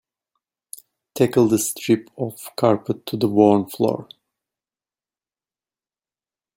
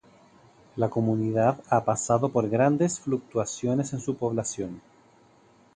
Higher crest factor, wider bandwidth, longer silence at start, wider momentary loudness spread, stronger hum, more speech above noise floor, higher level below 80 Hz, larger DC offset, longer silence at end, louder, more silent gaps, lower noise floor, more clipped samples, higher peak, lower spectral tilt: about the same, 20 dB vs 20 dB; first, 17 kHz vs 10 kHz; first, 1.15 s vs 0.75 s; first, 22 LU vs 9 LU; neither; first, over 71 dB vs 33 dB; about the same, -62 dBFS vs -62 dBFS; neither; first, 2.55 s vs 0.95 s; first, -20 LUFS vs -26 LUFS; neither; first, under -90 dBFS vs -58 dBFS; neither; first, -2 dBFS vs -8 dBFS; about the same, -5.5 dB/octave vs -6.5 dB/octave